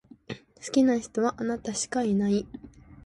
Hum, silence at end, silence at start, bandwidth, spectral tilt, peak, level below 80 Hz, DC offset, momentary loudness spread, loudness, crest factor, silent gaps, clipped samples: none; 0.1 s; 0.3 s; 11.5 kHz; -5 dB/octave; -12 dBFS; -58 dBFS; under 0.1%; 19 LU; -27 LUFS; 16 dB; none; under 0.1%